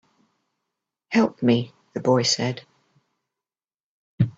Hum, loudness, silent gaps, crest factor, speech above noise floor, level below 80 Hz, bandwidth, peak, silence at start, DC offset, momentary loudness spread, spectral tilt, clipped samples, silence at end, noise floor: none; -22 LUFS; 3.74-4.18 s; 20 dB; over 69 dB; -58 dBFS; 8 kHz; -6 dBFS; 1.1 s; under 0.1%; 10 LU; -5 dB/octave; under 0.1%; 0.05 s; under -90 dBFS